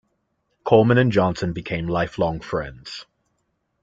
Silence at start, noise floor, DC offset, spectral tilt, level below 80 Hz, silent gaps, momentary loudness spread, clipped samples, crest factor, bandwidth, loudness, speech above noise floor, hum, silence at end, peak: 0.65 s; -72 dBFS; under 0.1%; -7.5 dB/octave; -48 dBFS; none; 18 LU; under 0.1%; 20 dB; 7.6 kHz; -21 LUFS; 52 dB; none; 0.8 s; -2 dBFS